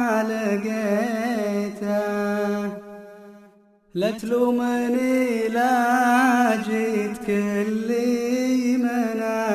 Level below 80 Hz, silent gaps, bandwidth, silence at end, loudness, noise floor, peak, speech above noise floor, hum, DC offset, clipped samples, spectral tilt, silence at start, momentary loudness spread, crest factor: -64 dBFS; none; 14.5 kHz; 0 s; -22 LUFS; -54 dBFS; -6 dBFS; 33 dB; none; under 0.1%; under 0.1%; -5.5 dB/octave; 0 s; 7 LU; 16 dB